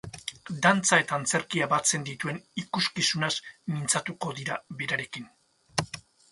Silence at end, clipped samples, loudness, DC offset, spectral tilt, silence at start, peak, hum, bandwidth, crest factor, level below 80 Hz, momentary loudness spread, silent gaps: 0.3 s; under 0.1%; -27 LUFS; under 0.1%; -2.5 dB/octave; 0.05 s; -6 dBFS; none; 11.5 kHz; 24 dB; -64 dBFS; 15 LU; none